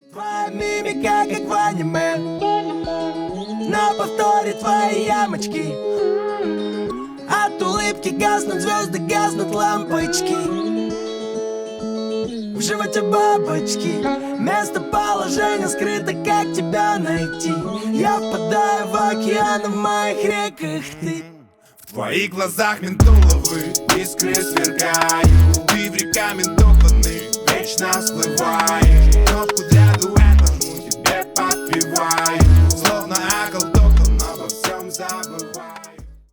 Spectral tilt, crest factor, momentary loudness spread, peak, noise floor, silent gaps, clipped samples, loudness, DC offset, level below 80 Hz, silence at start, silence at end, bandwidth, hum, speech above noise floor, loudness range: -4.5 dB/octave; 16 dB; 12 LU; 0 dBFS; -48 dBFS; none; under 0.1%; -18 LUFS; under 0.1%; -22 dBFS; 0.15 s; 0.15 s; over 20 kHz; none; 30 dB; 6 LU